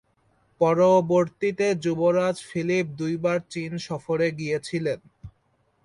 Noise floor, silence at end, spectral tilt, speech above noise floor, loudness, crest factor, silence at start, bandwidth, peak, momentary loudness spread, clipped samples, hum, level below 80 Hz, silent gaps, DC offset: -68 dBFS; 0.55 s; -6.5 dB/octave; 44 dB; -24 LUFS; 18 dB; 0.6 s; 11 kHz; -8 dBFS; 11 LU; under 0.1%; none; -62 dBFS; none; under 0.1%